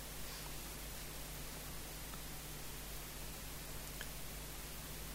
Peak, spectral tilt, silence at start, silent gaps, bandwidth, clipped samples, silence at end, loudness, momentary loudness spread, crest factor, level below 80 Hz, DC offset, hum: -28 dBFS; -2.5 dB/octave; 0 s; none; 16 kHz; under 0.1%; 0 s; -47 LUFS; 1 LU; 20 dB; -54 dBFS; under 0.1%; none